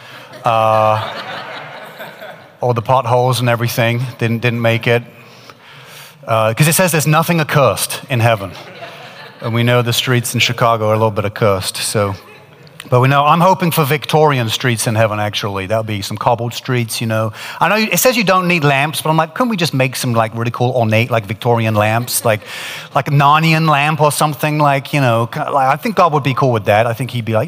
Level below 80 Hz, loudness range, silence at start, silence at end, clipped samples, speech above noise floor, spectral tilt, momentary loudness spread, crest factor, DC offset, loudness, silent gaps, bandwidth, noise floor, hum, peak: -56 dBFS; 3 LU; 0 s; 0 s; under 0.1%; 26 dB; -5 dB/octave; 13 LU; 14 dB; under 0.1%; -14 LUFS; none; 16 kHz; -40 dBFS; none; 0 dBFS